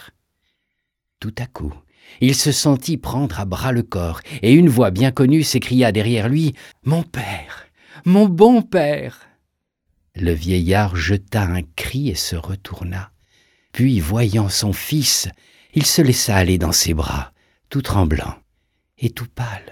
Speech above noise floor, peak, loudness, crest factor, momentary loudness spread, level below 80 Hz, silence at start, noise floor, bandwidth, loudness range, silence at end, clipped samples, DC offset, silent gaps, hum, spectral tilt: 59 dB; 0 dBFS; -18 LUFS; 18 dB; 15 LU; -38 dBFS; 1.2 s; -76 dBFS; 19.5 kHz; 5 LU; 0.1 s; under 0.1%; under 0.1%; none; none; -5 dB/octave